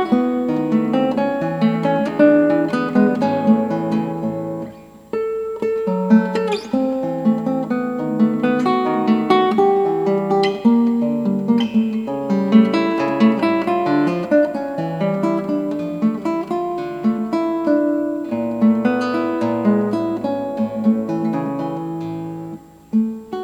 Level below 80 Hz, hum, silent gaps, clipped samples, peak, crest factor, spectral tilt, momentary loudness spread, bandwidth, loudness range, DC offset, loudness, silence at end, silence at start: -58 dBFS; none; none; under 0.1%; 0 dBFS; 18 dB; -8 dB/octave; 9 LU; 8 kHz; 4 LU; under 0.1%; -18 LUFS; 0 s; 0 s